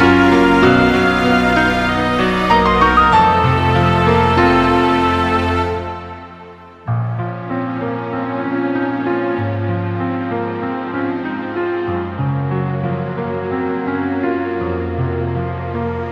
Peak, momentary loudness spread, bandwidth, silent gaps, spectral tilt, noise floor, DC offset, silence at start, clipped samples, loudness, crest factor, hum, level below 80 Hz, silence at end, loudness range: 0 dBFS; 11 LU; 15 kHz; none; -7 dB/octave; -37 dBFS; under 0.1%; 0 s; under 0.1%; -16 LUFS; 16 dB; none; -36 dBFS; 0 s; 8 LU